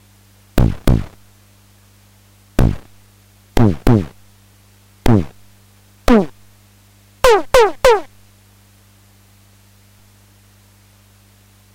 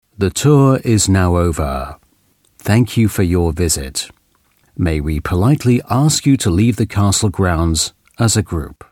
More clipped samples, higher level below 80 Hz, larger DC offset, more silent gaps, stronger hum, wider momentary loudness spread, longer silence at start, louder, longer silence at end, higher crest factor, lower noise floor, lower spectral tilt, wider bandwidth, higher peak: neither; about the same, -26 dBFS vs -30 dBFS; neither; neither; first, 50 Hz at -40 dBFS vs none; first, 15 LU vs 11 LU; first, 0.55 s vs 0.2 s; about the same, -16 LUFS vs -15 LUFS; first, 3.7 s vs 0.2 s; about the same, 18 dB vs 14 dB; second, -49 dBFS vs -58 dBFS; about the same, -6.5 dB/octave vs -5.5 dB/octave; about the same, 16 kHz vs 17 kHz; about the same, 0 dBFS vs 0 dBFS